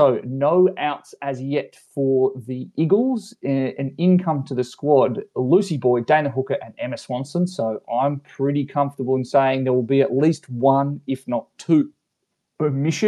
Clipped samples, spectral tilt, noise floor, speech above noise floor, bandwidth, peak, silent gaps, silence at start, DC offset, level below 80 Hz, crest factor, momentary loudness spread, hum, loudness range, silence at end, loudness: under 0.1%; -7.5 dB/octave; -77 dBFS; 56 dB; 11.5 kHz; -2 dBFS; none; 0 s; under 0.1%; -74 dBFS; 18 dB; 9 LU; none; 3 LU; 0 s; -21 LUFS